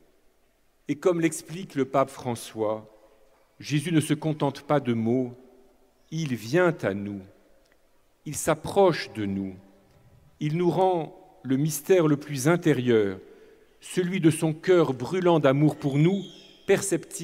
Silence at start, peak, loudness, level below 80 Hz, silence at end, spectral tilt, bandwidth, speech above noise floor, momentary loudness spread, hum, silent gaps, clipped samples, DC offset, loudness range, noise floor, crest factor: 0.9 s; -8 dBFS; -25 LUFS; -64 dBFS; 0 s; -6 dB/octave; 16 kHz; 40 dB; 13 LU; none; none; under 0.1%; under 0.1%; 5 LU; -64 dBFS; 18 dB